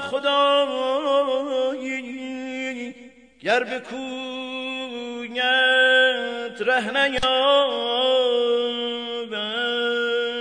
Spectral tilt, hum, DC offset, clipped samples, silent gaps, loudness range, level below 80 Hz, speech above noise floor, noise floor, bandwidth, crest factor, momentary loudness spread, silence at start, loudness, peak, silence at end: -2.5 dB/octave; none; under 0.1%; under 0.1%; none; 9 LU; -56 dBFS; 27 dB; -47 dBFS; 10 kHz; 16 dB; 13 LU; 0 s; -22 LUFS; -8 dBFS; 0 s